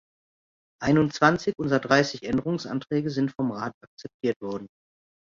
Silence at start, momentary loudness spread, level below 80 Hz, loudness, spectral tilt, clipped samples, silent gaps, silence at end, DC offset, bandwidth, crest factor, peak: 0.8 s; 14 LU; -58 dBFS; -25 LUFS; -6 dB/octave; under 0.1%; 3.74-3.81 s, 3.87-3.97 s, 4.14-4.20 s, 4.36-4.40 s; 0.65 s; under 0.1%; 7.6 kHz; 22 dB; -4 dBFS